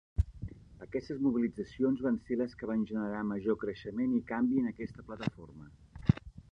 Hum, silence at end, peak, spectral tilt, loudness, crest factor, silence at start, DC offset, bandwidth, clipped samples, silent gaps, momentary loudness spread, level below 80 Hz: none; 0.1 s; -10 dBFS; -9 dB/octave; -34 LUFS; 24 dB; 0.2 s; under 0.1%; 6.6 kHz; under 0.1%; none; 16 LU; -48 dBFS